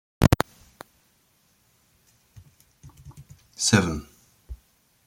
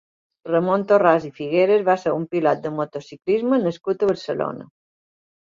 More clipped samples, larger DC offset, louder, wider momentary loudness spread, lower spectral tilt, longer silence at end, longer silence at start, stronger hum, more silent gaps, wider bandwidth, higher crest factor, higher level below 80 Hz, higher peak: neither; neither; about the same, -23 LUFS vs -21 LUFS; first, 28 LU vs 12 LU; second, -4.5 dB/octave vs -7.5 dB/octave; second, 0.5 s vs 0.85 s; second, 0.2 s vs 0.45 s; neither; neither; first, 16.5 kHz vs 7.4 kHz; first, 28 dB vs 20 dB; first, -44 dBFS vs -66 dBFS; about the same, 0 dBFS vs -2 dBFS